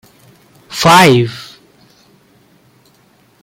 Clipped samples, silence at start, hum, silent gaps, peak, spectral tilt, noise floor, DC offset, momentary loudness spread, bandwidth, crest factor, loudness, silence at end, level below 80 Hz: under 0.1%; 0.7 s; none; none; 0 dBFS; -4.5 dB/octave; -51 dBFS; under 0.1%; 21 LU; 17 kHz; 16 dB; -9 LUFS; 2 s; -50 dBFS